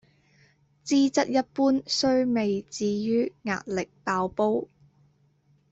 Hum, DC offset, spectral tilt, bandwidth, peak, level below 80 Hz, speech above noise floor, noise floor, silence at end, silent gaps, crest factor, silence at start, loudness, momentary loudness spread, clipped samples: none; under 0.1%; -4.5 dB/octave; 8 kHz; -10 dBFS; -64 dBFS; 39 dB; -64 dBFS; 1.05 s; none; 16 dB; 0.85 s; -26 LUFS; 8 LU; under 0.1%